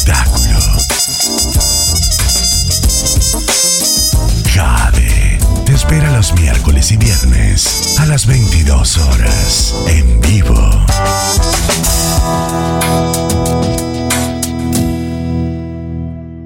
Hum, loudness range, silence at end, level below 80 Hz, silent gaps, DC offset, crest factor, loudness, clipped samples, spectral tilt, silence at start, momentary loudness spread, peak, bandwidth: none; 4 LU; 0 s; -14 dBFS; none; under 0.1%; 8 dB; -11 LUFS; under 0.1%; -3.5 dB/octave; 0 s; 6 LU; -2 dBFS; 17 kHz